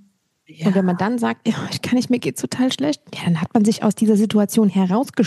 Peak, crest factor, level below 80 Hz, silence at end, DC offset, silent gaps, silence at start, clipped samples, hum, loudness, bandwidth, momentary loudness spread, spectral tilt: -2 dBFS; 16 dB; -64 dBFS; 0 s; under 0.1%; none; 0.6 s; under 0.1%; none; -19 LUFS; 12.5 kHz; 7 LU; -6 dB/octave